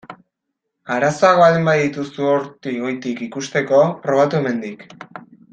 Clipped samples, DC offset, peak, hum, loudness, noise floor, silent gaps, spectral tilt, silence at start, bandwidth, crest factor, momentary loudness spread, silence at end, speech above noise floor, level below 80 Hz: under 0.1%; under 0.1%; -2 dBFS; none; -17 LUFS; -77 dBFS; none; -6 dB/octave; 0.1 s; 9 kHz; 18 dB; 17 LU; 0.3 s; 60 dB; -62 dBFS